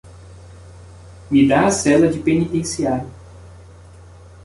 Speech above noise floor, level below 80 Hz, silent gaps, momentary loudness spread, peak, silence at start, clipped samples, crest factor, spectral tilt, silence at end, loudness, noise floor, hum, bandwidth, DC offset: 26 dB; -44 dBFS; none; 8 LU; -4 dBFS; 0.05 s; under 0.1%; 16 dB; -5.5 dB/octave; 0.85 s; -17 LUFS; -42 dBFS; none; 11.5 kHz; under 0.1%